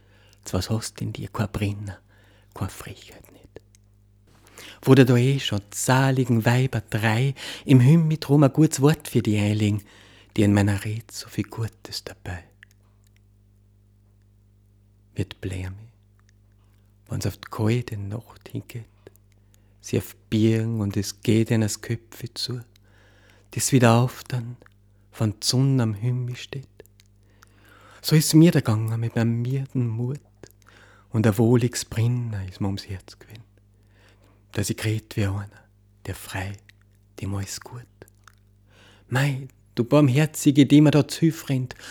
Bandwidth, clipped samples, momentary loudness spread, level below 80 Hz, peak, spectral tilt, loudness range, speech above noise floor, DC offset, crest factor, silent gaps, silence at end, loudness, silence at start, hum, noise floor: 19 kHz; under 0.1%; 19 LU; -56 dBFS; 0 dBFS; -6 dB/octave; 16 LU; 35 dB; under 0.1%; 24 dB; none; 0 s; -23 LUFS; 0.45 s; 50 Hz at -55 dBFS; -57 dBFS